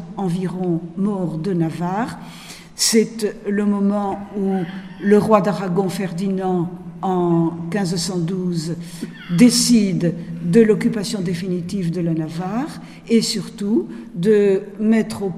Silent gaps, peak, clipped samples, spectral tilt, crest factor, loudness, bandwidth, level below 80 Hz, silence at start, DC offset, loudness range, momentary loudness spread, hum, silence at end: none; 0 dBFS; under 0.1%; -5.5 dB/octave; 18 dB; -19 LUFS; 15.5 kHz; -54 dBFS; 0 s; under 0.1%; 4 LU; 12 LU; none; 0 s